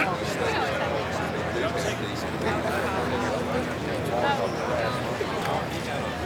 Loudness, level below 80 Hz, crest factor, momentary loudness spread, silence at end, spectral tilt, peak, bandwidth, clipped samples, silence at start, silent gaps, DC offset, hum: -27 LUFS; -48 dBFS; 16 dB; 4 LU; 0 s; -5 dB/octave; -10 dBFS; over 20 kHz; under 0.1%; 0 s; none; under 0.1%; none